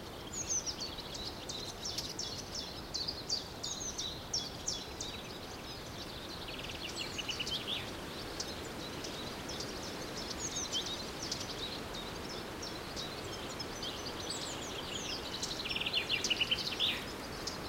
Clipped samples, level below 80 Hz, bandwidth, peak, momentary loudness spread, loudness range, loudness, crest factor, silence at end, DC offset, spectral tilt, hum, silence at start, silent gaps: under 0.1%; -56 dBFS; 16 kHz; -20 dBFS; 9 LU; 6 LU; -38 LUFS; 20 dB; 0 s; under 0.1%; -2 dB/octave; none; 0 s; none